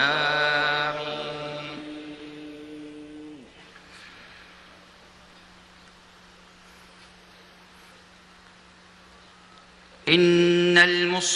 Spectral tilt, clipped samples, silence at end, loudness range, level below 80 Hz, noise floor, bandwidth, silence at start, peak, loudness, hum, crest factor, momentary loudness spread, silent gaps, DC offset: -3.5 dB/octave; under 0.1%; 0 s; 27 LU; -64 dBFS; -52 dBFS; 11 kHz; 0 s; -2 dBFS; -21 LUFS; none; 24 dB; 28 LU; none; under 0.1%